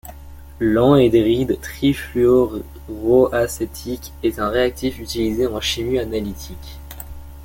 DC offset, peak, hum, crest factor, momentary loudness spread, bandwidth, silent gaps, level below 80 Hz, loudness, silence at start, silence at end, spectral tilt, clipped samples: under 0.1%; -2 dBFS; none; 18 dB; 20 LU; 17 kHz; none; -36 dBFS; -19 LUFS; 0.05 s; 0 s; -6 dB/octave; under 0.1%